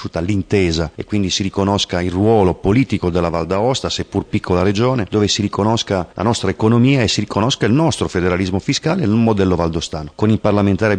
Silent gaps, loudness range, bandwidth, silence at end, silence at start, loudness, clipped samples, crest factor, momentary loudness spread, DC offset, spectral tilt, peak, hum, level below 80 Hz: none; 1 LU; 10 kHz; 0 s; 0 s; -17 LUFS; under 0.1%; 14 dB; 6 LU; under 0.1%; -5.5 dB/octave; -2 dBFS; none; -38 dBFS